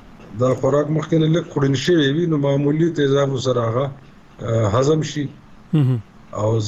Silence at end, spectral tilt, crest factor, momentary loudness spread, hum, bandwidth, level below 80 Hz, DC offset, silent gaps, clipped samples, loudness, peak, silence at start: 0 s; -7 dB/octave; 10 dB; 9 LU; none; 8 kHz; -50 dBFS; under 0.1%; none; under 0.1%; -19 LUFS; -8 dBFS; 0.05 s